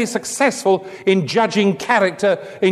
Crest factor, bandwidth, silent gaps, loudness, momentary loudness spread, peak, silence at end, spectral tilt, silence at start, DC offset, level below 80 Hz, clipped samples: 16 dB; 13.5 kHz; none; -17 LUFS; 3 LU; -2 dBFS; 0 s; -4.5 dB/octave; 0 s; under 0.1%; -64 dBFS; under 0.1%